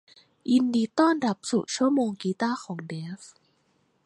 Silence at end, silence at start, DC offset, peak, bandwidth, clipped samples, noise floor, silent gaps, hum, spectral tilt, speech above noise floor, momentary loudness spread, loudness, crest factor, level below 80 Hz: 0.8 s; 0.45 s; under 0.1%; -8 dBFS; 11 kHz; under 0.1%; -69 dBFS; none; none; -5 dB/octave; 43 dB; 14 LU; -26 LUFS; 18 dB; -76 dBFS